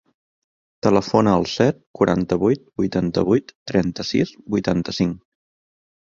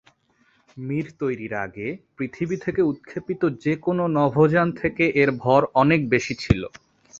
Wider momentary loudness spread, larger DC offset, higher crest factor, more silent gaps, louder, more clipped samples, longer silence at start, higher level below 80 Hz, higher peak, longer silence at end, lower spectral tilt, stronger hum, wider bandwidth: second, 6 LU vs 13 LU; neither; about the same, 20 dB vs 20 dB; first, 1.87-1.94 s, 3.55-3.66 s vs none; about the same, -20 LUFS vs -22 LUFS; neither; about the same, 0.85 s vs 0.75 s; about the same, -48 dBFS vs -46 dBFS; about the same, -2 dBFS vs -2 dBFS; first, 0.95 s vs 0.5 s; about the same, -6.5 dB/octave vs -7 dB/octave; neither; about the same, 7.6 kHz vs 7.8 kHz